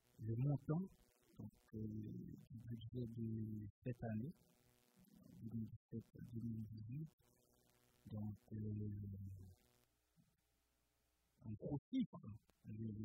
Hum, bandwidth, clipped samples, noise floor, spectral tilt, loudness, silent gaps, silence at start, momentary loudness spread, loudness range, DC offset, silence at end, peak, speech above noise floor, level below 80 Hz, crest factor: none; 15.5 kHz; under 0.1%; -84 dBFS; -9.5 dB/octave; -50 LUFS; 3.70-3.82 s, 5.76-5.89 s, 7.13-7.18 s, 11.79-11.92 s, 12.06-12.12 s; 0.2 s; 15 LU; 5 LU; under 0.1%; 0 s; -30 dBFS; 36 dB; -72 dBFS; 20 dB